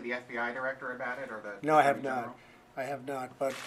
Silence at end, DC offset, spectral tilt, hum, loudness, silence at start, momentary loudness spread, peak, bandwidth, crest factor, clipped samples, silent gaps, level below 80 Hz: 0 s; under 0.1%; -5 dB/octave; none; -32 LUFS; 0 s; 15 LU; -10 dBFS; 15 kHz; 22 dB; under 0.1%; none; -74 dBFS